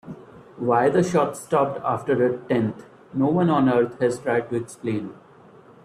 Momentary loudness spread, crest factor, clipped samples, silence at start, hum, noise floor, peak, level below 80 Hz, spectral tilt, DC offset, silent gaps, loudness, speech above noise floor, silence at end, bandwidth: 12 LU; 16 dB; under 0.1%; 0.05 s; none; -49 dBFS; -8 dBFS; -62 dBFS; -7 dB/octave; under 0.1%; none; -23 LUFS; 27 dB; 0.7 s; 13.5 kHz